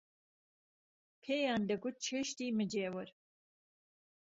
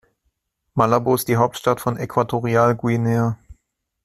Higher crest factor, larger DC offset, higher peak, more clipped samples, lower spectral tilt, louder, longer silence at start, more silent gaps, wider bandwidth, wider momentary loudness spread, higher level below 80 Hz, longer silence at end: about the same, 18 dB vs 18 dB; neither; second, -24 dBFS vs -2 dBFS; neither; second, -4 dB/octave vs -6.5 dB/octave; second, -38 LUFS vs -20 LUFS; first, 1.25 s vs 0.75 s; neither; second, 7.6 kHz vs 14 kHz; first, 12 LU vs 6 LU; second, -80 dBFS vs -52 dBFS; first, 1.2 s vs 0.5 s